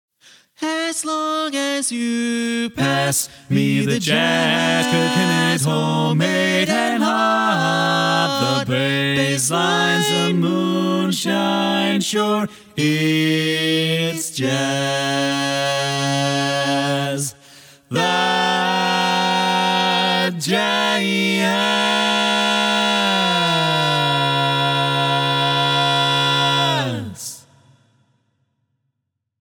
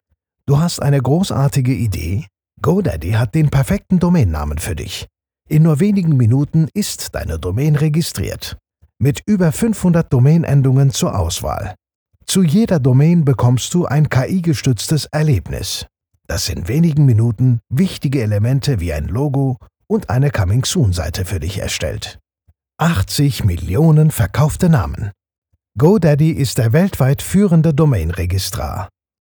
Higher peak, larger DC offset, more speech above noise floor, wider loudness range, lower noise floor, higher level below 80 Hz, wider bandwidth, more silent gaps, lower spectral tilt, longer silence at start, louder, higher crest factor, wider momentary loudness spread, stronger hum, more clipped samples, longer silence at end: second, -4 dBFS vs 0 dBFS; neither; first, 58 dB vs 44 dB; about the same, 3 LU vs 3 LU; first, -76 dBFS vs -59 dBFS; second, -64 dBFS vs -34 dBFS; about the same, 19.5 kHz vs over 20 kHz; second, none vs 11.95-12.06 s, 25.38-25.42 s; second, -4 dB/octave vs -6.5 dB/octave; about the same, 0.6 s vs 0.5 s; about the same, -18 LUFS vs -16 LUFS; about the same, 16 dB vs 14 dB; second, 5 LU vs 11 LU; neither; neither; first, 2.05 s vs 0.5 s